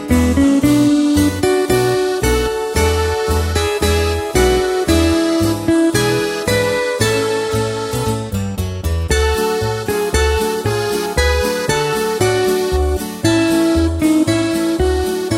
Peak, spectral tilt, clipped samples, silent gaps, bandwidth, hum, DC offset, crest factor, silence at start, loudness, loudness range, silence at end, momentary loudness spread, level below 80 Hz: 0 dBFS; -5 dB/octave; under 0.1%; none; 16.5 kHz; none; under 0.1%; 14 dB; 0 s; -16 LUFS; 3 LU; 0 s; 6 LU; -26 dBFS